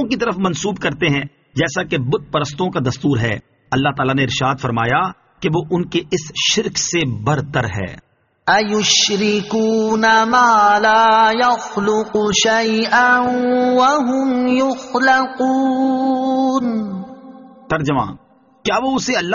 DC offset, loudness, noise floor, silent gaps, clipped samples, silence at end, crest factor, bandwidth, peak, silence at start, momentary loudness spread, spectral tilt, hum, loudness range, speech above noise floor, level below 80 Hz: under 0.1%; -16 LUFS; -39 dBFS; none; under 0.1%; 0 s; 16 dB; 7.4 kHz; 0 dBFS; 0 s; 10 LU; -3 dB/octave; none; 6 LU; 23 dB; -48 dBFS